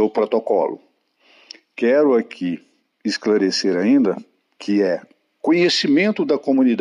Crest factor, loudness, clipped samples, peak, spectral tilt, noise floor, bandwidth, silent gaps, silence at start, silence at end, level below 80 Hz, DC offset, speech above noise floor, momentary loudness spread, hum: 12 dB; -19 LUFS; under 0.1%; -6 dBFS; -5 dB/octave; -57 dBFS; 11 kHz; none; 0 s; 0 s; -74 dBFS; under 0.1%; 40 dB; 12 LU; none